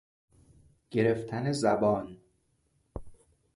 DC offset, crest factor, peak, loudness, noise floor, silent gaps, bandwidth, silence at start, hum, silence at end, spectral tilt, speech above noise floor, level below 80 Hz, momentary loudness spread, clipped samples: under 0.1%; 20 dB; -12 dBFS; -29 LUFS; -72 dBFS; none; 11.5 kHz; 0.9 s; none; 0.4 s; -6.5 dB/octave; 44 dB; -56 dBFS; 21 LU; under 0.1%